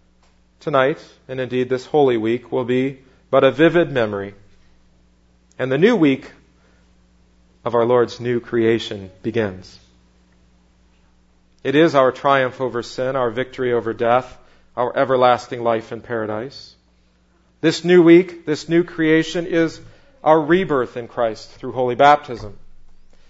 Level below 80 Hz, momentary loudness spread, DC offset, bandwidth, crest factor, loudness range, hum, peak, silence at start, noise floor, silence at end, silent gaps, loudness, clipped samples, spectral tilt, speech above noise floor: -50 dBFS; 15 LU; under 0.1%; 8 kHz; 20 dB; 5 LU; none; 0 dBFS; 0.65 s; -57 dBFS; 0.5 s; none; -18 LUFS; under 0.1%; -6.5 dB/octave; 40 dB